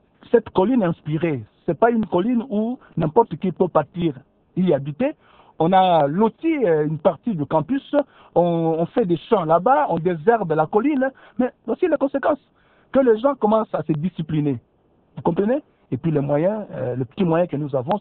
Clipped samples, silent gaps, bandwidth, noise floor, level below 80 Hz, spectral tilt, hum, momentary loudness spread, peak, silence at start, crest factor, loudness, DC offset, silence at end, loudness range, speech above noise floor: under 0.1%; none; 4.3 kHz; -60 dBFS; -54 dBFS; -11.5 dB/octave; none; 8 LU; -2 dBFS; 0.35 s; 18 dB; -21 LUFS; under 0.1%; 0 s; 3 LU; 40 dB